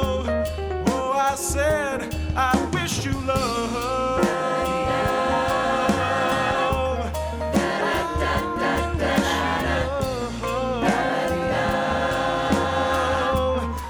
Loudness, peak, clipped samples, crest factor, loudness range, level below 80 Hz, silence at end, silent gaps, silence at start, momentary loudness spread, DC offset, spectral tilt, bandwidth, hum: -23 LUFS; -6 dBFS; under 0.1%; 16 dB; 1 LU; -34 dBFS; 0 s; none; 0 s; 4 LU; under 0.1%; -5 dB/octave; over 20 kHz; none